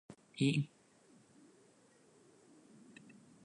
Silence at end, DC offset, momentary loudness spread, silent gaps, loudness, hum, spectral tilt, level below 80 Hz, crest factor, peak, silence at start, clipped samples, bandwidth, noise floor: 2.8 s; under 0.1%; 27 LU; none; -36 LUFS; none; -6 dB/octave; -84 dBFS; 22 dB; -20 dBFS; 0.1 s; under 0.1%; 11 kHz; -67 dBFS